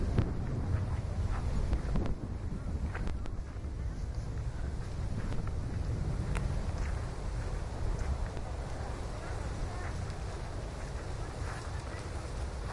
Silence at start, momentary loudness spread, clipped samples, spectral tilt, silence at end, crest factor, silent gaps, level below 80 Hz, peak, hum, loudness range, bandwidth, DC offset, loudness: 0 s; 6 LU; under 0.1%; -6.5 dB/octave; 0 s; 18 dB; none; -38 dBFS; -16 dBFS; none; 4 LU; 11.5 kHz; under 0.1%; -38 LUFS